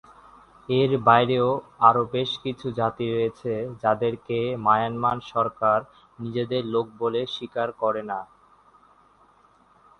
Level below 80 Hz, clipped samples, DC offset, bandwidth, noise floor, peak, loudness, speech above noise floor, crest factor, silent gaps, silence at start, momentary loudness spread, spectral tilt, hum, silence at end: -60 dBFS; under 0.1%; under 0.1%; 9.8 kHz; -58 dBFS; -2 dBFS; -24 LUFS; 34 dB; 22 dB; none; 0.7 s; 11 LU; -7.5 dB/octave; none; 1.75 s